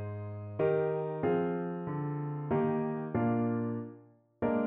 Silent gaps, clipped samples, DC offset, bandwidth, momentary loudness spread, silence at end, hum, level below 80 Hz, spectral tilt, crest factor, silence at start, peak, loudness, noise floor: none; under 0.1%; under 0.1%; 3.8 kHz; 10 LU; 0 s; none; -66 dBFS; -9 dB/octave; 14 dB; 0 s; -18 dBFS; -33 LUFS; -57 dBFS